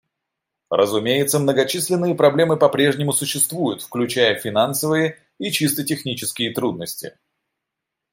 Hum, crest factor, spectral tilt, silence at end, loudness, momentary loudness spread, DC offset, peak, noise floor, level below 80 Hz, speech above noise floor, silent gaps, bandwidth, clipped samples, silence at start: none; 18 dB; -4 dB/octave; 1.05 s; -19 LUFS; 8 LU; under 0.1%; -2 dBFS; -82 dBFS; -64 dBFS; 63 dB; none; 16.5 kHz; under 0.1%; 0.7 s